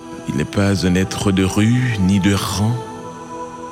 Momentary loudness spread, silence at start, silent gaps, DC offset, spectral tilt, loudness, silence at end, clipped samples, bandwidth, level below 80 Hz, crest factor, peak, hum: 15 LU; 0 s; none; under 0.1%; -5.5 dB/octave; -17 LUFS; 0 s; under 0.1%; 16 kHz; -42 dBFS; 14 dB; -4 dBFS; none